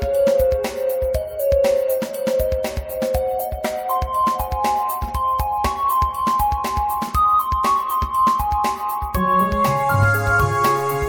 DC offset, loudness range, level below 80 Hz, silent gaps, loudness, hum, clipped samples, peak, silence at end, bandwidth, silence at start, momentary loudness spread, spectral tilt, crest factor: under 0.1%; 3 LU; -32 dBFS; none; -20 LUFS; none; under 0.1%; -6 dBFS; 0 s; over 20 kHz; 0 s; 6 LU; -5.5 dB/octave; 14 dB